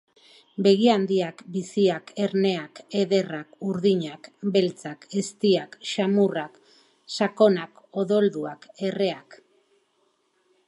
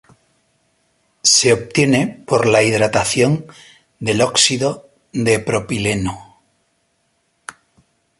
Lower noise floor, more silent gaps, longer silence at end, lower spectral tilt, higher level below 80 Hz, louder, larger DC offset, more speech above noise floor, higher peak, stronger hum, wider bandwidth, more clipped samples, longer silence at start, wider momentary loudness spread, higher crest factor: first, -69 dBFS vs -65 dBFS; neither; second, 1.35 s vs 1.95 s; first, -6 dB/octave vs -3.5 dB/octave; second, -76 dBFS vs -48 dBFS; second, -24 LUFS vs -16 LUFS; neither; second, 45 dB vs 49 dB; second, -6 dBFS vs 0 dBFS; neither; about the same, 11 kHz vs 11.5 kHz; neither; second, 0.6 s vs 1.25 s; second, 13 LU vs 19 LU; about the same, 20 dB vs 18 dB